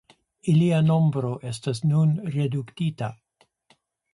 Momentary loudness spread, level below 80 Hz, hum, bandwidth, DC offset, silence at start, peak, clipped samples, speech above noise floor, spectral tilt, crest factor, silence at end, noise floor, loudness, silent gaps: 11 LU; -62 dBFS; none; 11.5 kHz; under 0.1%; 0.45 s; -10 dBFS; under 0.1%; 42 dB; -8 dB/octave; 14 dB; 1 s; -64 dBFS; -24 LUFS; none